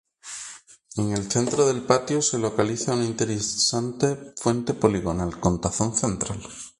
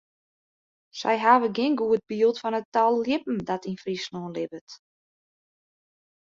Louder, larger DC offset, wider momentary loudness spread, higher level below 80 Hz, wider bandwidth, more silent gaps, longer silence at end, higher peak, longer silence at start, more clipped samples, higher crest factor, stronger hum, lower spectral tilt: about the same, -24 LUFS vs -25 LUFS; neither; about the same, 12 LU vs 13 LU; first, -46 dBFS vs -68 dBFS; first, 11.5 kHz vs 7.6 kHz; second, none vs 2.65-2.72 s, 4.61-4.67 s; second, 0.1 s vs 1.55 s; about the same, -2 dBFS vs -4 dBFS; second, 0.25 s vs 0.95 s; neither; about the same, 22 dB vs 22 dB; neither; about the same, -4.5 dB/octave vs -5.5 dB/octave